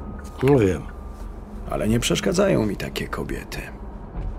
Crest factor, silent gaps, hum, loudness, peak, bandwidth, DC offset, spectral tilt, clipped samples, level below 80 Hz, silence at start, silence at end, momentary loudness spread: 18 dB; none; none; -23 LUFS; -6 dBFS; 16 kHz; under 0.1%; -5.5 dB/octave; under 0.1%; -34 dBFS; 0 s; 0 s; 19 LU